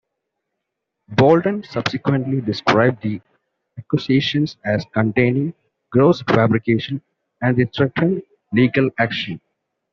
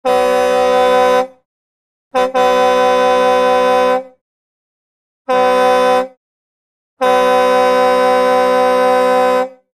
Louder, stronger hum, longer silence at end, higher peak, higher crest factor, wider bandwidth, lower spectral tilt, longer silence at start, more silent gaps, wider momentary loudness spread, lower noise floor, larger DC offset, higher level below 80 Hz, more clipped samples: second, -19 LUFS vs -12 LUFS; neither; first, 0.55 s vs 0.25 s; about the same, -2 dBFS vs 0 dBFS; first, 18 dB vs 12 dB; second, 7.2 kHz vs 15.5 kHz; first, -5.5 dB/octave vs -3.5 dB/octave; first, 1.1 s vs 0.05 s; second, none vs 1.45-2.11 s, 4.21-5.25 s, 6.17-6.97 s; first, 11 LU vs 6 LU; second, -79 dBFS vs under -90 dBFS; neither; about the same, -54 dBFS vs -50 dBFS; neither